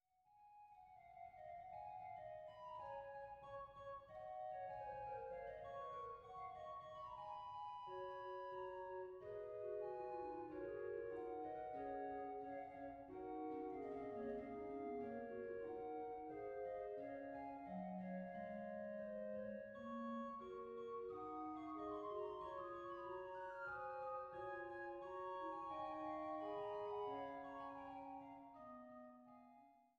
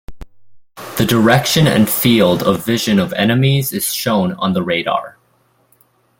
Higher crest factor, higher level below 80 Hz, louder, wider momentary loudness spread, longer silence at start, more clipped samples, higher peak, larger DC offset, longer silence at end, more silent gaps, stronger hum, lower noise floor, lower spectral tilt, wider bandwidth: about the same, 14 dB vs 16 dB; second, -78 dBFS vs -44 dBFS; second, -51 LUFS vs -14 LUFS; about the same, 7 LU vs 7 LU; first, 0.25 s vs 0.1 s; neither; second, -38 dBFS vs 0 dBFS; neither; second, 0.1 s vs 1.1 s; neither; neither; first, -72 dBFS vs -58 dBFS; about the same, -5 dB/octave vs -5 dB/octave; second, 7.4 kHz vs 17 kHz